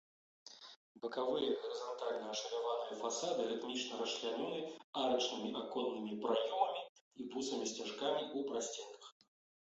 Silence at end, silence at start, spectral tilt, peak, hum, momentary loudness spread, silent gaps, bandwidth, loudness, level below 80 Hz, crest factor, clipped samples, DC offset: 0.5 s; 0.45 s; -1.5 dB/octave; -20 dBFS; none; 16 LU; 0.76-0.95 s, 4.84-4.93 s, 6.89-6.95 s, 7.01-7.11 s; 8 kHz; -40 LUFS; -84 dBFS; 20 dB; under 0.1%; under 0.1%